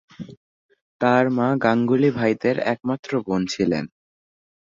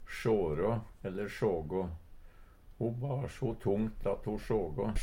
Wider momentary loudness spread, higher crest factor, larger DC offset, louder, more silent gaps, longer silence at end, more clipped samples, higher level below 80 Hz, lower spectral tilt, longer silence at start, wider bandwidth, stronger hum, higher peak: first, 15 LU vs 7 LU; about the same, 20 dB vs 16 dB; neither; first, -21 LUFS vs -35 LUFS; first, 0.37-0.69 s, 0.81-1.00 s, 2.99-3.03 s vs none; first, 0.85 s vs 0 s; neither; second, -58 dBFS vs -46 dBFS; about the same, -6.5 dB/octave vs -7.5 dB/octave; first, 0.2 s vs 0 s; second, 7.6 kHz vs 16.5 kHz; neither; first, -4 dBFS vs -18 dBFS